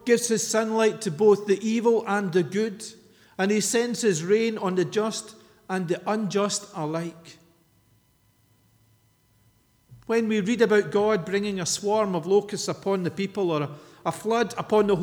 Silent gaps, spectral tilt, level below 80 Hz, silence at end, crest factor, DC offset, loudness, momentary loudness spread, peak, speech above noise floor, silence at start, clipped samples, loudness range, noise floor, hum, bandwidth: none; -4.5 dB/octave; -66 dBFS; 0 s; 18 dB; under 0.1%; -25 LUFS; 9 LU; -8 dBFS; 40 dB; 0.05 s; under 0.1%; 8 LU; -64 dBFS; none; 18.5 kHz